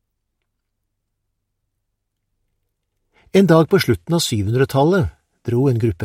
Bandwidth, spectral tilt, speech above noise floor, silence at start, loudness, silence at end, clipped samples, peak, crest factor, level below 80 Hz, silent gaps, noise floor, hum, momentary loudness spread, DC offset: 16.5 kHz; -6 dB/octave; 59 dB; 3.35 s; -17 LUFS; 0 s; under 0.1%; -2 dBFS; 18 dB; -46 dBFS; none; -75 dBFS; none; 8 LU; under 0.1%